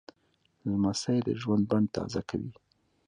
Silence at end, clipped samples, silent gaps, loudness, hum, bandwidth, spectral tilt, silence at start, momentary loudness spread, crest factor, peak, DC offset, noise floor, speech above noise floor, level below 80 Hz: 0.55 s; under 0.1%; none; -30 LUFS; none; 10.5 kHz; -6.5 dB/octave; 0.65 s; 10 LU; 16 dB; -14 dBFS; under 0.1%; -71 dBFS; 42 dB; -58 dBFS